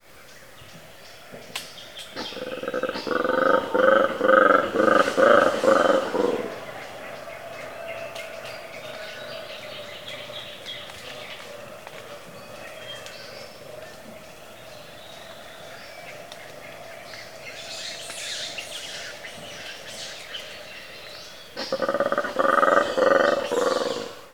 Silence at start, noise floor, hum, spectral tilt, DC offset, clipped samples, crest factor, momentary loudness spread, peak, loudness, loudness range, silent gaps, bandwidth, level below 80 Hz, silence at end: 0.15 s; -48 dBFS; none; -3.5 dB/octave; 0.3%; under 0.1%; 24 dB; 22 LU; -2 dBFS; -23 LUFS; 20 LU; none; 19.5 kHz; -64 dBFS; 0.05 s